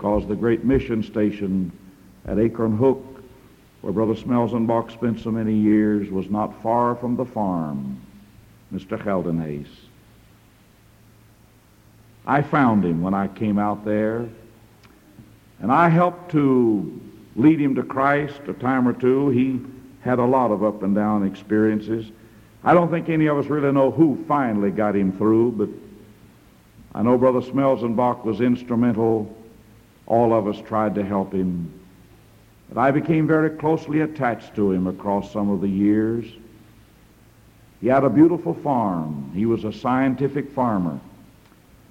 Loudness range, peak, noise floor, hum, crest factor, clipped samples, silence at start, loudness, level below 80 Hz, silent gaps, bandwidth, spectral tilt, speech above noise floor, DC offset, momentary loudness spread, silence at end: 5 LU; -4 dBFS; -53 dBFS; none; 18 dB; under 0.1%; 0 s; -21 LUFS; -50 dBFS; none; 9.8 kHz; -9 dB/octave; 33 dB; under 0.1%; 12 LU; 0.85 s